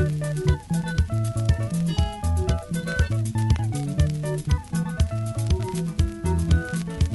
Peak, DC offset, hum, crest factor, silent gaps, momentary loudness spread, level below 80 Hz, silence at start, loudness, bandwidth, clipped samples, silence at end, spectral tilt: -8 dBFS; under 0.1%; none; 16 dB; none; 3 LU; -30 dBFS; 0 s; -25 LUFS; 12 kHz; under 0.1%; 0 s; -6.5 dB/octave